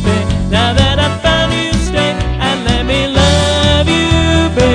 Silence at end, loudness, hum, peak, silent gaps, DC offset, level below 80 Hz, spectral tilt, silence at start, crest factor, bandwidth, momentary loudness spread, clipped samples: 0 s; -12 LUFS; none; 0 dBFS; none; under 0.1%; -20 dBFS; -5 dB/octave; 0 s; 12 dB; 10 kHz; 4 LU; under 0.1%